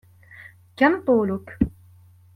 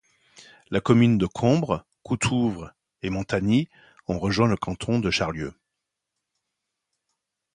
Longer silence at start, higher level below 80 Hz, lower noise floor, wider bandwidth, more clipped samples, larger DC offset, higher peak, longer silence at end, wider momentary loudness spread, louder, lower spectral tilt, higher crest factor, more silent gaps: second, 0.4 s vs 0.7 s; about the same, -44 dBFS vs -48 dBFS; second, -51 dBFS vs -83 dBFS; first, 13 kHz vs 11 kHz; neither; neither; about the same, -6 dBFS vs -4 dBFS; second, 0.65 s vs 2.05 s; second, 8 LU vs 15 LU; about the same, -22 LUFS vs -24 LUFS; first, -8.5 dB/octave vs -6 dB/octave; about the same, 20 dB vs 20 dB; neither